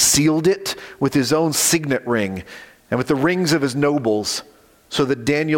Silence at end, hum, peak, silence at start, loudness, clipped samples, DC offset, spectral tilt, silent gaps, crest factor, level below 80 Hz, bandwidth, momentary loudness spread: 0 s; none; -4 dBFS; 0 s; -19 LUFS; under 0.1%; under 0.1%; -3.5 dB/octave; none; 14 dB; -52 dBFS; 17 kHz; 11 LU